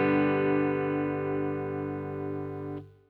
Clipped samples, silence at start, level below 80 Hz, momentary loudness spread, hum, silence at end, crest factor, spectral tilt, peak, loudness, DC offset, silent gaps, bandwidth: under 0.1%; 0 s; -64 dBFS; 11 LU; 50 Hz at -60 dBFS; 0.2 s; 14 dB; -10 dB/octave; -16 dBFS; -30 LUFS; under 0.1%; none; 4.5 kHz